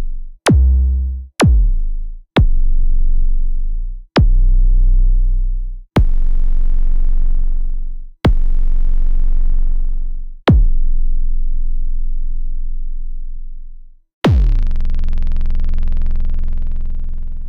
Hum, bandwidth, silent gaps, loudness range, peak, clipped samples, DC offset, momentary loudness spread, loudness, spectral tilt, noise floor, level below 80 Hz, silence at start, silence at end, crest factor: none; 11.5 kHz; 14.13-14.21 s; 4 LU; -2 dBFS; under 0.1%; under 0.1%; 14 LU; -20 LUFS; -6.5 dB/octave; -32 dBFS; -12 dBFS; 0 s; 0 s; 10 dB